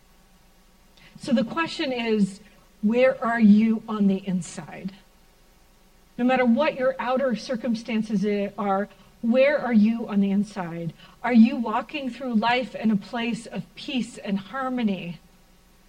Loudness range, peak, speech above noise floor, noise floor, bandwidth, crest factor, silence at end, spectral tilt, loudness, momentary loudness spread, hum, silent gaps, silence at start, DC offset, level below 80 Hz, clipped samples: 4 LU; -6 dBFS; 33 dB; -56 dBFS; 10 kHz; 18 dB; 0.7 s; -6.5 dB/octave; -24 LUFS; 15 LU; none; none; 1.2 s; under 0.1%; -58 dBFS; under 0.1%